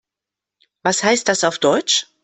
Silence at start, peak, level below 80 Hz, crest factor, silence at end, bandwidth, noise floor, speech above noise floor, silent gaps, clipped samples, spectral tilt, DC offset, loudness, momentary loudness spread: 0.85 s; -2 dBFS; -60 dBFS; 18 dB; 0.2 s; 8.6 kHz; -86 dBFS; 68 dB; none; under 0.1%; -2 dB/octave; under 0.1%; -17 LUFS; 4 LU